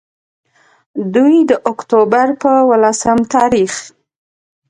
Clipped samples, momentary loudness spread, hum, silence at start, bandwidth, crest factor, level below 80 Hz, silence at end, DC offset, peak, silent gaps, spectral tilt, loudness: under 0.1%; 9 LU; none; 0.95 s; 11 kHz; 14 dB; -50 dBFS; 0.8 s; under 0.1%; 0 dBFS; none; -5 dB/octave; -12 LUFS